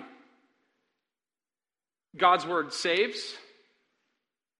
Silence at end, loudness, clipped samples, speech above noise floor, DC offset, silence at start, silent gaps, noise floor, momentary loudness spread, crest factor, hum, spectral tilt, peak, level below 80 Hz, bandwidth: 1.2 s; -26 LUFS; under 0.1%; over 63 dB; under 0.1%; 0 s; none; under -90 dBFS; 15 LU; 24 dB; none; -2.5 dB/octave; -8 dBFS; -82 dBFS; 11.5 kHz